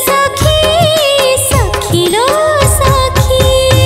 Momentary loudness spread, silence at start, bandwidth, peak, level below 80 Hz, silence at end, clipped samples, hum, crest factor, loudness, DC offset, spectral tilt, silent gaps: 2 LU; 0 s; 16.5 kHz; 0 dBFS; -20 dBFS; 0 s; under 0.1%; none; 10 dB; -9 LUFS; under 0.1%; -4 dB/octave; none